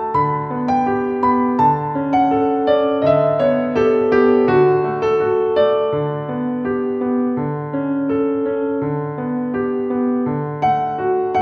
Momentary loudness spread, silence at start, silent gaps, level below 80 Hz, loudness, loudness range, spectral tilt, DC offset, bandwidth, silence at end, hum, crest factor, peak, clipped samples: 7 LU; 0 s; none; -50 dBFS; -18 LUFS; 5 LU; -9 dB/octave; under 0.1%; 6.2 kHz; 0 s; none; 14 dB; -2 dBFS; under 0.1%